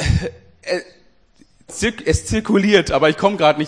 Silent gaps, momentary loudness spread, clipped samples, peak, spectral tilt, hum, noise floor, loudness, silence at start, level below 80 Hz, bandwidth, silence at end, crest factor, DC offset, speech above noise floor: none; 13 LU; under 0.1%; 0 dBFS; -5 dB/octave; none; -54 dBFS; -17 LUFS; 0 s; -32 dBFS; 10.5 kHz; 0 s; 18 dB; 0.2%; 38 dB